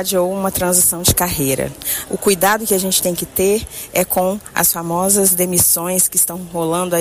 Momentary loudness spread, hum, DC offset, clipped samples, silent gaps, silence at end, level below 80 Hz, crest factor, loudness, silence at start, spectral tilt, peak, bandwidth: 8 LU; none; under 0.1%; under 0.1%; none; 0 s; -40 dBFS; 16 dB; -15 LUFS; 0 s; -3 dB/octave; 0 dBFS; 16 kHz